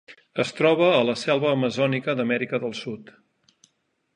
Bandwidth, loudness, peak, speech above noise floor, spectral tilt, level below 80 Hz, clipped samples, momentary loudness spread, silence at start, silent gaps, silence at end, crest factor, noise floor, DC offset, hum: 10.5 kHz; -23 LUFS; -6 dBFS; 49 dB; -5.5 dB/octave; -70 dBFS; under 0.1%; 15 LU; 0.1 s; none; 1.1 s; 18 dB; -71 dBFS; under 0.1%; none